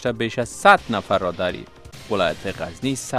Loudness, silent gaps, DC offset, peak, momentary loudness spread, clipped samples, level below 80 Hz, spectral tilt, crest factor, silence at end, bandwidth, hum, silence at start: -21 LUFS; none; under 0.1%; 0 dBFS; 16 LU; under 0.1%; -48 dBFS; -4.5 dB/octave; 20 dB; 0 s; 15.5 kHz; none; 0 s